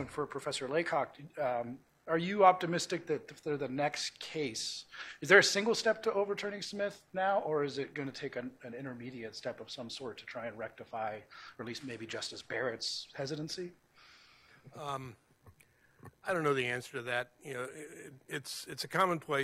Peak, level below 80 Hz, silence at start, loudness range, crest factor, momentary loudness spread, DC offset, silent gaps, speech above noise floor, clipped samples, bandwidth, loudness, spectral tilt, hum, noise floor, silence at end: -8 dBFS; -76 dBFS; 0 s; 12 LU; 28 dB; 14 LU; under 0.1%; none; 31 dB; under 0.1%; 15.5 kHz; -35 LUFS; -3.5 dB/octave; none; -66 dBFS; 0 s